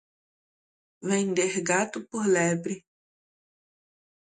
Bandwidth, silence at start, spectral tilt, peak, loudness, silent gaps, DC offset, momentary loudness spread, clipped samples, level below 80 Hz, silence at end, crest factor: 9.6 kHz; 1 s; -4.5 dB/octave; -8 dBFS; -26 LUFS; none; under 0.1%; 12 LU; under 0.1%; -72 dBFS; 1.45 s; 22 dB